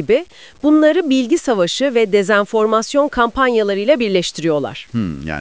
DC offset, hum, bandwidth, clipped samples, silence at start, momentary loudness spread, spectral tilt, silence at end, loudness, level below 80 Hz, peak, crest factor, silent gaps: 0.4%; none; 8 kHz; under 0.1%; 0 s; 8 LU; -5 dB/octave; 0 s; -16 LUFS; -44 dBFS; -2 dBFS; 14 dB; none